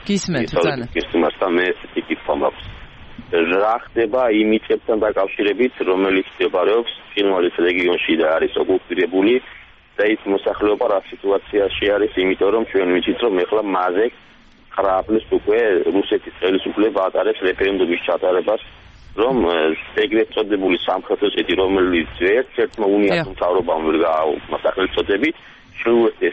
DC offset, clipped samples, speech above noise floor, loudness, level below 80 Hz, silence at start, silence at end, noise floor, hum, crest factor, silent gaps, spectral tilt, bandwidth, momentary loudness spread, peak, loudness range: under 0.1%; under 0.1%; 19 dB; -18 LUFS; -46 dBFS; 0 s; 0 s; -37 dBFS; none; 14 dB; none; -5.5 dB/octave; 8.2 kHz; 5 LU; -4 dBFS; 2 LU